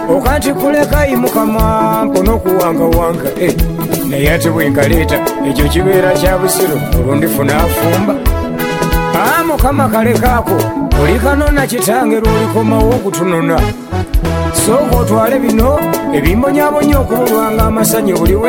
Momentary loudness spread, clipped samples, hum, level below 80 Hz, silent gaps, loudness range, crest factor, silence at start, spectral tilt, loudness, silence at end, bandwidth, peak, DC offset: 4 LU; under 0.1%; none; -20 dBFS; none; 1 LU; 10 dB; 0 s; -5.5 dB/octave; -12 LUFS; 0 s; 17 kHz; 0 dBFS; under 0.1%